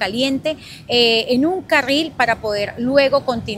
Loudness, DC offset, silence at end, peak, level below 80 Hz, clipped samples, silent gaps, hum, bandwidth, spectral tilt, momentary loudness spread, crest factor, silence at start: -17 LUFS; under 0.1%; 0 s; 0 dBFS; -48 dBFS; under 0.1%; none; none; 16 kHz; -4 dB/octave; 8 LU; 16 dB; 0 s